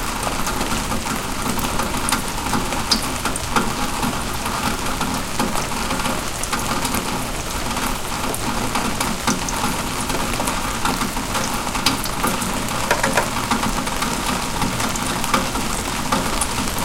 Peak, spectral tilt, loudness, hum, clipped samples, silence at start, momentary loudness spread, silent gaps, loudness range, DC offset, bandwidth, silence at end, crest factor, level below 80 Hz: 0 dBFS; -3 dB/octave; -21 LUFS; none; under 0.1%; 0 s; 3 LU; none; 2 LU; under 0.1%; 17 kHz; 0 s; 22 dB; -30 dBFS